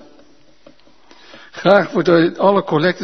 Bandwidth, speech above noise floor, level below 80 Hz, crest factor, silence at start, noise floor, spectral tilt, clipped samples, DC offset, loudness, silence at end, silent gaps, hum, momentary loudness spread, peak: 6.4 kHz; 37 dB; -62 dBFS; 18 dB; 1.55 s; -51 dBFS; -7 dB/octave; under 0.1%; 0.5%; -14 LUFS; 0 s; none; none; 6 LU; 0 dBFS